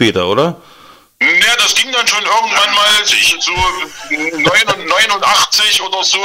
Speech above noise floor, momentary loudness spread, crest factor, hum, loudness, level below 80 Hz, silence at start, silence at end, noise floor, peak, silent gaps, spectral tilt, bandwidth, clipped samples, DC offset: 29 dB; 7 LU; 12 dB; none; -10 LUFS; -40 dBFS; 0 s; 0 s; -41 dBFS; 0 dBFS; none; -1 dB/octave; 16.5 kHz; under 0.1%; under 0.1%